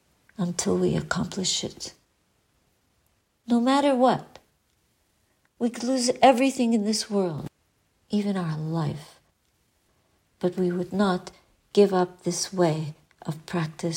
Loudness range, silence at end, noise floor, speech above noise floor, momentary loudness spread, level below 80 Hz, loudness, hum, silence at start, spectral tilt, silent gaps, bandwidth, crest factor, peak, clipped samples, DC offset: 6 LU; 0 s; -69 dBFS; 45 dB; 16 LU; -60 dBFS; -25 LUFS; none; 0.4 s; -5 dB/octave; none; 16 kHz; 20 dB; -6 dBFS; under 0.1%; under 0.1%